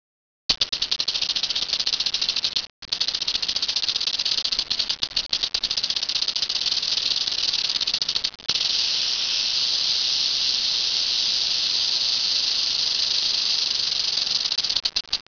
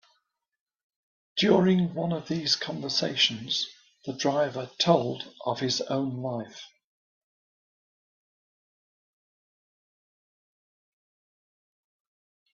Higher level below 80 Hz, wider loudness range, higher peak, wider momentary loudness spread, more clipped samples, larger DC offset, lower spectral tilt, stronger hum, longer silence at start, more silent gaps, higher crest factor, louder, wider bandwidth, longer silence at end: first, -54 dBFS vs -70 dBFS; second, 3 LU vs 9 LU; about the same, -4 dBFS vs -6 dBFS; second, 4 LU vs 12 LU; neither; neither; second, 1.5 dB/octave vs -4.5 dB/octave; neither; second, 0.5 s vs 1.35 s; first, 2.70-2.82 s vs none; about the same, 20 dB vs 24 dB; first, -20 LUFS vs -27 LUFS; second, 5.4 kHz vs 7.2 kHz; second, 0.15 s vs 5.9 s